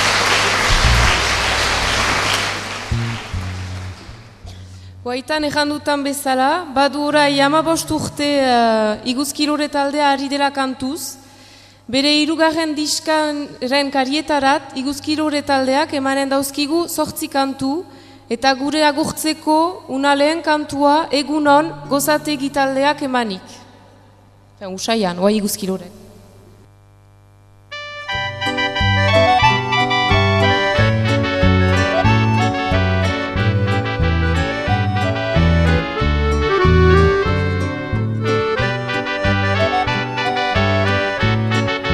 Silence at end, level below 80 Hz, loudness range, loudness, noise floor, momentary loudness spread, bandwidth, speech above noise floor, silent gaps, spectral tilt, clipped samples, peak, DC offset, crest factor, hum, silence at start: 0 s; -32 dBFS; 8 LU; -17 LUFS; -47 dBFS; 9 LU; 14.5 kHz; 30 dB; none; -4.5 dB/octave; under 0.1%; 0 dBFS; under 0.1%; 16 dB; none; 0 s